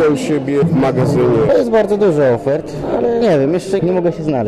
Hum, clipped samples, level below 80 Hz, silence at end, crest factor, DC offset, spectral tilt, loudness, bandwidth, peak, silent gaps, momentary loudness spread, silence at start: none; under 0.1%; -42 dBFS; 0 s; 8 dB; under 0.1%; -7.5 dB/octave; -14 LUFS; 12.5 kHz; -4 dBFS; none; 5 LU; 0 s